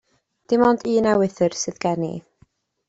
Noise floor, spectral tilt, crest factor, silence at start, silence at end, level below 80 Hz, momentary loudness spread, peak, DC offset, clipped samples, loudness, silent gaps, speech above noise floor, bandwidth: -59 dBFS; -5.5 dB/octave; 18 dB; 0.5 s; 0.7 s; -58 dBFS; 9 LU; -4 dBFS; under 0.1%; under 0.1%; -21 LUFS; none; 40 dB; 8 kHz